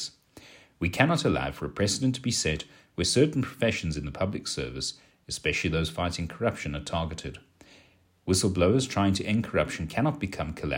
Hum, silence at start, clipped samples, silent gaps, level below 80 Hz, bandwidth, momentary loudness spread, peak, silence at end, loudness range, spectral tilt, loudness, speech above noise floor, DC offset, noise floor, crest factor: none; 0 s; under 0.1%; none; -46 dBFS; 16 kHz; 10 LU; -4 dBFS; 0 s; 4 LU; -4.5 dB/octave; -28 LUFS; 33 dB; under 0.1%; -61 dBFS; 24 dB